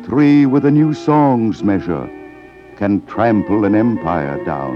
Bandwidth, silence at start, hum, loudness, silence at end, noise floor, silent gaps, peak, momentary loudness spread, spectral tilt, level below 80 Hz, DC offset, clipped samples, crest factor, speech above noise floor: 7 kHz; 0 s; none; -15 LUFS; 0 s; -38 dBFS; none; -2 dBFS; 11 LU; -9 dB/octave; -46 dBFS; under 0.1%; under 0.1%; 12 dB; 24 dB